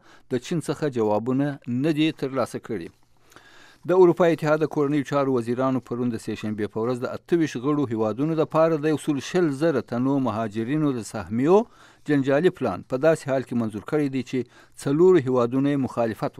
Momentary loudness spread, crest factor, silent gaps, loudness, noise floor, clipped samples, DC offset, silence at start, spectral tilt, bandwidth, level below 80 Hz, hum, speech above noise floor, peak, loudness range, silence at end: 10 LU; 18 dB; none; -23 LUFS; -52 dBFS; under 0.1%; under 0.1%; 0.3 s; -7 dB/octave; 13.5 kHz; -64 dBFS; none; 30 dB; -6 dBFS; 3 LU; 0.1 s